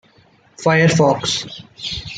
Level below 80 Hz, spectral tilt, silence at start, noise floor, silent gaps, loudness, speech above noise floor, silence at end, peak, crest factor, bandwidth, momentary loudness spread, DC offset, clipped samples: -48 dBFS; -4.5 dB/octave; 0.6 s; -53 dBFS; none; -16 LUFS; 36 dB; 0 s; -2 dBFS; 16 dB; 9.2 kHz; 14 LU; under 0.1%; under 0.1%